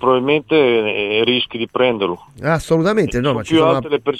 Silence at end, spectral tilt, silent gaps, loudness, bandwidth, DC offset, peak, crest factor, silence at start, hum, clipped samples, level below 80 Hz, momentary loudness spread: 0 s; -6 dB/octave; none; -16 LUFS; 13 kHz; under 0.1%; -2 dBFS; 14 dB; 0 s; none; under 0.1%; -44 dBFS; 6 LU